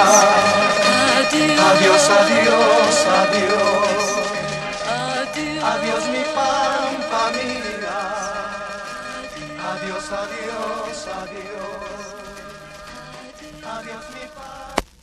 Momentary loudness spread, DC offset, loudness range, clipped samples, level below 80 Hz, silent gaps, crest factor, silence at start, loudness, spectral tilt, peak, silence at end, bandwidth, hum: 22 LU; under 0.1%; 18 LU; under 0.1%; -50 dBFS; none; 18 dB; 0 s; -17 LUFS; -2.5 dB/octave; 0 dBFS; 0.2 s; 14 kHz; none